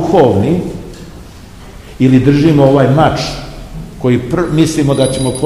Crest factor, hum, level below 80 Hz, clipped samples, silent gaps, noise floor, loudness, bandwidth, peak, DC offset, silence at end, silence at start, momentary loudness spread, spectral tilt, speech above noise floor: 12 dB; none; -32 dBFS; 0.7%; none; -33 dBFS; -11 LUFS; 13.5 kHz; 0 dBFS; 0.4%; 0 s; 0 s; 20 LU; -6.5 dB/octave; 23 dB